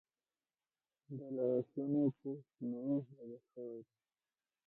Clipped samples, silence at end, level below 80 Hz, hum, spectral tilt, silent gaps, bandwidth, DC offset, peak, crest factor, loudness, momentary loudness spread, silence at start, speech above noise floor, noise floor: under 0.1%; 0.85 s; -88 dBFS; none; -13 dB/octave; none; 1.5 kHz; under 0.1%; -24 dBFS; 18 dB; -40 LUFS; 17 LU; 1.1 s; over 50 dB; under -90 dBFS